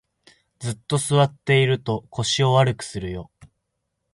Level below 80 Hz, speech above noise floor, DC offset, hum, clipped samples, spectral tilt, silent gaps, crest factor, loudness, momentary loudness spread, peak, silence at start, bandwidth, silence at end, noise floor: -50 dBFS; 56 dB; under 0.1%; none; under 0.1%; -5 dB/octave; none; 18 dB; -21 LUFS; 13 LU; -4 dBFS; 0.6 s; 11.5 kHz; 0.7 s; -77 dBFS